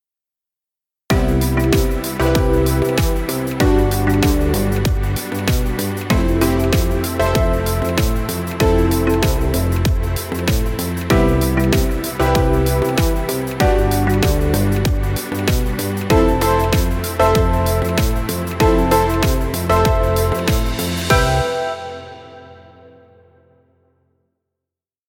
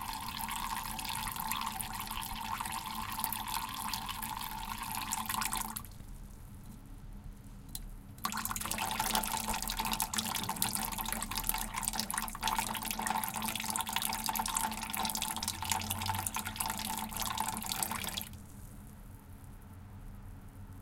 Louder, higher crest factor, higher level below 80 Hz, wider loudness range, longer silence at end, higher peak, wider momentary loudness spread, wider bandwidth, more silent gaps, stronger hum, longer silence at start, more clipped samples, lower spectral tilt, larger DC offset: first, -17 LUFS vs -35 LUFS; second, 16 dB vs 32 dB; first, -22 dBFS vs -50 dBFS; second, 2 LU vs 6 LU; first, 2.55 s vs 0 s; first, 0 dBFS vs -6 dBFS; second, 6 LU vs 18 LU; first, 19 kHz vs 17 kHz; neither; neither; first, 1.1 s vs 0 s; neither; first, -5.5 dB/octave vs -1.5 dB/octave; neither